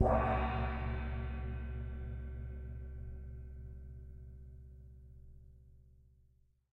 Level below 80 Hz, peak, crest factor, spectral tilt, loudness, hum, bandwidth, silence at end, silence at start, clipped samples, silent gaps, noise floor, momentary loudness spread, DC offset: -44 dBFS; -16 dBFS; 24 dB; -9.5 dB/octave; -40 LUFS; none; 4.3 kHz; 0.7 s; 0 s; under 0.1%; none; -70 dBFS; 23 LU; under 0.1%